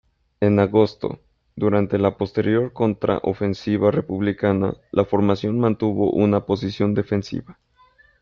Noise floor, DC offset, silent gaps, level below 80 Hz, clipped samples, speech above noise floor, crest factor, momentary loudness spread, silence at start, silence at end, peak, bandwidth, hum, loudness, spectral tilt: -56 dBFS; under 0.1%; none; -54 dBFS; under 0.1%; 36 dB; 16 dB; 6 LU; 0.4 s; 0.7 s; -4 dBFS; 7 kHz; none; -21 LUFS; -8.5 dB/octave